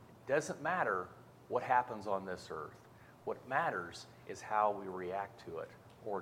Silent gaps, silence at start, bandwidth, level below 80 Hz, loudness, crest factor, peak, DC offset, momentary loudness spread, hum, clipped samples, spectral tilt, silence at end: none; 0 s; 16.5 kHz; -74 dBFS; -38 LUFS; 22 dB; -18 dBFS; under 0.1%; 17 LU; none; under 0.1%; -5 dB/octave; 0 s